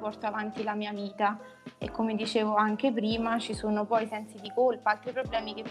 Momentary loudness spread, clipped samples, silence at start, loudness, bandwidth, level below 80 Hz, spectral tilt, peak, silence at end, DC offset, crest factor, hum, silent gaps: 10 LU; under 0.1%; 0 s; -30 LUFS; 11.5 kHz; -56 dBFS; -5.5 dB/octave; -12 dBFS; 0 s; under 0.1%; 18 dB; none; none